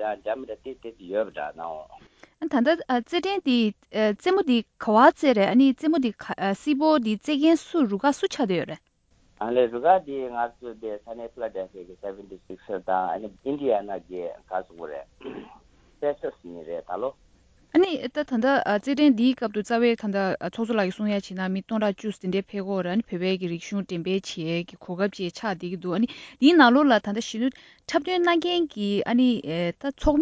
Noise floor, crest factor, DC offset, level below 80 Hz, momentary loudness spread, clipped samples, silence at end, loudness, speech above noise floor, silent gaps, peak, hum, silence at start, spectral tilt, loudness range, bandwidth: -62 dBFS; 22 dB; under 0.1%; -52 dBFS; 16 LU; under 0.1%; 0 s; -24 LUFS; 38 dB; none; -4 dBFS; none; 0 s; -6 dB/octave; 9 LU; 8 kHz